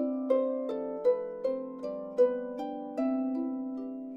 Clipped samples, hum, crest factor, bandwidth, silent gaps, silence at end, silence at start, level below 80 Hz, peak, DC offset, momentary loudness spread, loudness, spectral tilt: under 0.1%; none; 16 dB; 5.8 kHz; none; 0 s; 0 s; -74 dBFS; -14 dBFS; under 0.1%; 9 LU; -32 LUFS; -7.5 dB/octave